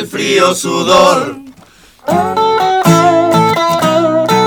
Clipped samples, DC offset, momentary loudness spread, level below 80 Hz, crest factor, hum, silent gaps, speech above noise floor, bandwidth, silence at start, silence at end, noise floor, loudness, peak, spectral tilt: under 0.1%; under 0.1%; 7 LU; -48 dBFS; 10 dB; none; none; 31 dB; 20 kHz; 0 s; 0 s; -42 dBFS; -10 LUFS; 0 dBFS; -4.5 dB/octave